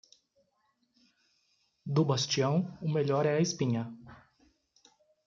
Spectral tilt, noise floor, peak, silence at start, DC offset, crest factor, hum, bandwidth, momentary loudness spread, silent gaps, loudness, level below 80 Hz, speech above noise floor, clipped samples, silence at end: -5.5 dB/octave; -75 dBFS; -16 dBFS; 1.85 s; under 0.1%; 18 dB; none; 7.6 kHz; 12 LU; none; -30 LUFS; -72 dBFS; 46 dB; under 0.1%; 1.15 s